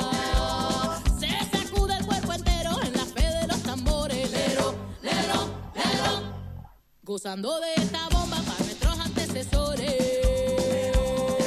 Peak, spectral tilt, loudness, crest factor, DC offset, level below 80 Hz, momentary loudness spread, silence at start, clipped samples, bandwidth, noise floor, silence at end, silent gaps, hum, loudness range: -10 dBFS; -4.5 dB/octave; -27 LUFS; 16 dB; under 0.1%; -32 dBFS; 5 LU; 0 s; under 0.1%; 15.5 kHz; -48 dBFS; 0 s; none; none; 2 LU